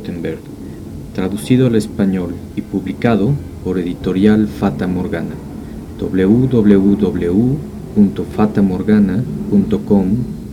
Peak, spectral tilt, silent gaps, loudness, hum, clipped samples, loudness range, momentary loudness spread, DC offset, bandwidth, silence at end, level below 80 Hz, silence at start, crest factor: 0 dBFS; -8.5 dB/octave; none; -15 LUFS; none; under 0.1%; 3 LU; 14 LU; under 0.1%; 12.5 kHz; 0 s; -36 dBFS; 0 s; 16 dB